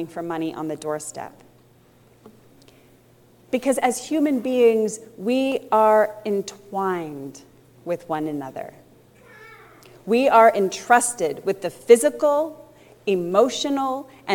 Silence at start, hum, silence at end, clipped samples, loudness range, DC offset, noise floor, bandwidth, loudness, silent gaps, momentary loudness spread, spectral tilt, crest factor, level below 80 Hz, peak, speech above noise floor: 0 s; none; 0 s; under 0.1%; 12 LU; under 0.1%; -54 dBFS; 18 kHz; -21 LUFS; none; 16 LU; -4 dB/octave; 20 dB; -68 dBFS; -2 dBFS; 33 dB